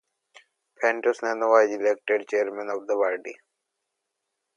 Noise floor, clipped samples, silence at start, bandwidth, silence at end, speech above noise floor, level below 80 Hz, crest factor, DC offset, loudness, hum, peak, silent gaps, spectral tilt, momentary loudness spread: -81 dBFS; under 0.1%; 0.8 s; 9.8 kHz; 1.25 s; 57 dB; -86 dBFS; 20 dB; under 0.1%; -24 LUFS; none; -6 dBFS; none; -3 dB/octave; 10 LU